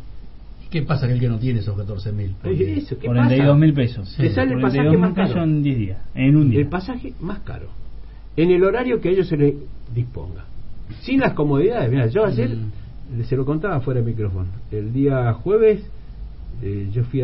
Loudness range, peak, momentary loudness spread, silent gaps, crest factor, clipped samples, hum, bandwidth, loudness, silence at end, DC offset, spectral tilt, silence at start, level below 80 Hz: 4 LU; -2 dBFS; 17 LU; none; 16 dB; under 0.1%; none; 5.8 kHz; -20 LUFS; 0 s; under 0.1%; -13 dB/octave; 0 s; -36 dBFS